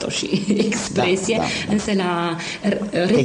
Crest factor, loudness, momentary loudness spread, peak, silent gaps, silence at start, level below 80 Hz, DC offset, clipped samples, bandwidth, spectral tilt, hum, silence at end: 14 dB; -21 LUFS; 4 LU; -6 dBFS; none; 0 s; -50 dBFS; under 0.1%; under 0.1%; 11 kHz; -4.5 dB/octave; none; 0 s